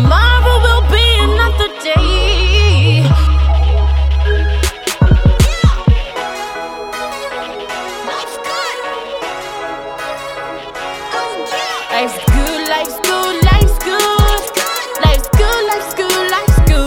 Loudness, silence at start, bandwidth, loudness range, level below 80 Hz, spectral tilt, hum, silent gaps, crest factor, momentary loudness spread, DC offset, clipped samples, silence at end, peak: -14 LUFS; 0 s; 17.5 kHz; 10 LU; -16 dBFS; -4.5 dB/octave; none; none; 12 dB; 12 LU; under 0.1%; under 0.1%; 0 s; 0 dBFS